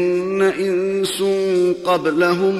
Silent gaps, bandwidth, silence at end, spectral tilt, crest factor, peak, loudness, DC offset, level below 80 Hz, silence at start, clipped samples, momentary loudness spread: none; 13.5 kHz; 0 s; -5 dB/octave; 12 dB; -6 dBFS; -18 LUFS; under 0.1%; -60 dBFS; 0 s; under 0.1%; 3 LU